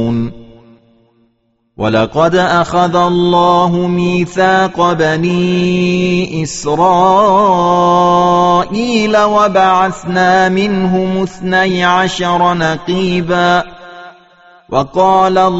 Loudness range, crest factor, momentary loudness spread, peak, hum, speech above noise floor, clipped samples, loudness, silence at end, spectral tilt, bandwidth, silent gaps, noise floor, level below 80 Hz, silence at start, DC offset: 3 LU; 12 dB; 6 LU; 0 dBFS; none; 49 dB; under 0.1%; -11 LUFS; 0 s; -4.5 dB/octave; 8 kHz; none; -60 dBFS; -42 dBFS; 0 s; 0.4%